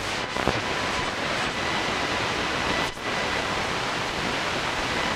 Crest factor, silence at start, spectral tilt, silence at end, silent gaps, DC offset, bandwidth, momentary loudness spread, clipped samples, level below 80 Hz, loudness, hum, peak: 22 dB; 0 s; -3 dB/octave; 0 s; none; under 0.1%; 16.5 kHz; 1 LU; under 0.1%; -46 dBFS; -26 LUFS; none; -4 dBFS